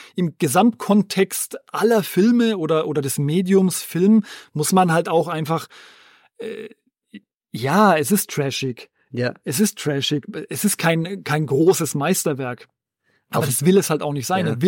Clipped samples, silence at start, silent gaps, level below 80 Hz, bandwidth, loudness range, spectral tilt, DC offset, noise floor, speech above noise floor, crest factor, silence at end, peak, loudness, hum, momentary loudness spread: under 0.1%; 0 s; 7.35-7.40 s; -66 dBFS; 17 kHz; 4 LU; -5 dB/octave; under 0.1%; -68 dBFS; 48 dB; 16 dB; 0 s; -4 dBFS; -19 LUFS; none; 12 LU